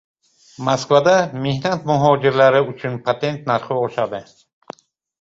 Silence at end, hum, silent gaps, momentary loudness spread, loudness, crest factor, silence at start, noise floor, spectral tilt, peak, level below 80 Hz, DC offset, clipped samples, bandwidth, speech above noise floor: 1 s; none; none; 10 LU; -18 LUFS; 18 dB; 0.6 s; -41 dBFS; -5.5 dB/octave; -2 dBFS; -56 dBFS; under 0.1%; under 0.1%; 7.8 kHz; 24 dB